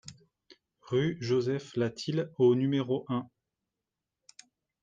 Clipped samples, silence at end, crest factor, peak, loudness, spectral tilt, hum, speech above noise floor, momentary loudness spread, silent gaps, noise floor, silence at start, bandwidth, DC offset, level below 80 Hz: under 0.1%; 1.55 s; 18 dB; -14 dBFS; -30 LUFS; -7 dB/octave; none; 60 dB; 10 LU; none; -88 dBFS; 0.05 s; 9 kHz; under 0.1%; -70 dBFS